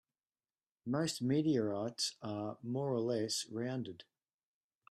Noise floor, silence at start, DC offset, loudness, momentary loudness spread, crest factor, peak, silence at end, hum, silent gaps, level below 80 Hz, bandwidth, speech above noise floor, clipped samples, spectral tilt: under -90 dBFS; 0.85 s; under 0.1%; -37 LUFS; 9 LU; 16 dB; -22 dBFS; 0.9 s; none; none; -78 dBFS; 13.5 kHz; over 53 dB; under 0.1%; -5 dB/octave